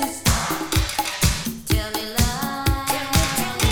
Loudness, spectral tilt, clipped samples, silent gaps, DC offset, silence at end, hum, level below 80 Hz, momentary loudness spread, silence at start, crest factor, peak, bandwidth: -22 LUFS; -3.5 dB/octave; under 0.1%; none; under 0.1%; 0 s; none; -28 dBFS; 4 LU; 0 s; 18 dB; -4 dBFS; over 20 kHz